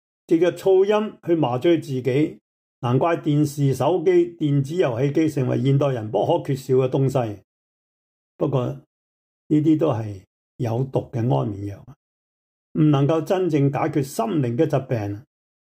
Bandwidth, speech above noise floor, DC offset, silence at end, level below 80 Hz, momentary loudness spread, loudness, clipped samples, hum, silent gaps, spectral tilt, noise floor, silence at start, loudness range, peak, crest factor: 15.5 kHz; over 70 dB; under 0.1%; 0.5 s; -62 dBFS; 11 LU; -21 LUFS; under 0.1%; none; 2.41-2.82 s, 7.44-8.39 s, 8.86-9.50 s, 10.27-10.59 s, 11.96-12.75 s; -8 dB/octave; under -90 dBFS; 0.3 s; 4 LU; -8 dBFS; 14 dB